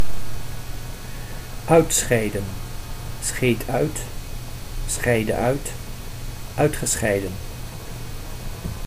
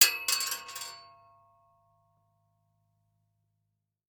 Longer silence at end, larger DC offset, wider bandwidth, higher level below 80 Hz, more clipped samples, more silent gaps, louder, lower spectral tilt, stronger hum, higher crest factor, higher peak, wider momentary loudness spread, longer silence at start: second, 0 s vs 3.1 s; neither; second, 15.5 kHz vs over 20 kHz; first, -34 dBFS vs -82 dBFS; neither; neither; first, -23 LUFS vs -29 LUFS; first, -4.5 dB/octave vs 3.5 dB/octave; neither; second, 20 dB vs 32 dB; about the same, -4 dBFS vs -2 dBFS; second, 16 LU vs 19 LU; about the same, 0 s vs 0 s